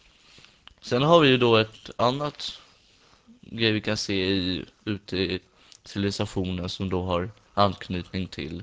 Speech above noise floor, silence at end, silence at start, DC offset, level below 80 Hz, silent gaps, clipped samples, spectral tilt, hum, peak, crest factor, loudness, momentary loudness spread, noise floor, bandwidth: 34 dB; 0 s; 0.85 s; under 0.1%; -48 dBFS; none; under 0.1%; -5.5 dB/octave; none; -4 dBFS; 22 dB; -25 LUFS; 15 LU; -59 dBFS; 8 kHz